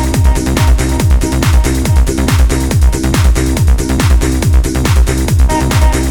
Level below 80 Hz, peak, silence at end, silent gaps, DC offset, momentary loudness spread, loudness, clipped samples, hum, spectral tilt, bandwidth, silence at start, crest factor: -12 dBFS; 0 dBFS; 0 s; none; under 0.1%; 1 LU; -12 LUFS; under 0.1%; none; -5.5 dB/octave; 18.5 kHz; 0 s; 10 dB